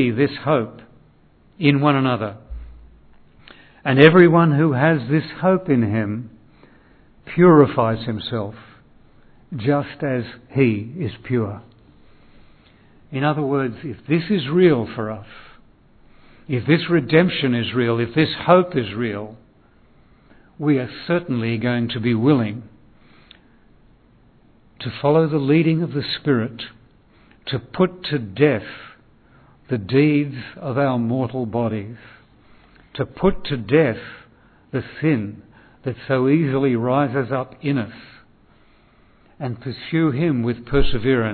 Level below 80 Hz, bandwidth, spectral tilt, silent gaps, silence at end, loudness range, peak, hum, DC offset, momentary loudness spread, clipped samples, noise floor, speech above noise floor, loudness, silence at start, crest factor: -42 dBFS; 4.5 kHz; -10.5 dB/octave; none; 0 s; 8 LU; 0 dBFS; none; under 0.1%; 15 LU; under 0.1%; -53 dBFS; 35 dB; -19 LUFS; 0 s; 20 dB